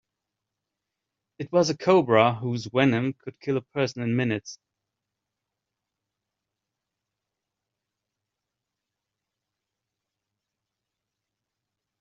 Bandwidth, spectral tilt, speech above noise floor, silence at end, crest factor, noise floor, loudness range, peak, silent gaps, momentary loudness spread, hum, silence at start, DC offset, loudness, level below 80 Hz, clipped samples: 7.4 kHz; -5 dB/octave; 62 dB; 7.45 s; 26 dB; -86 dBFS; 10 LU; -4 dBFS; none; 12 LU; none; 1.4 s; under 0.1%; -24 LUFS; -70 dBFS; under 0.1%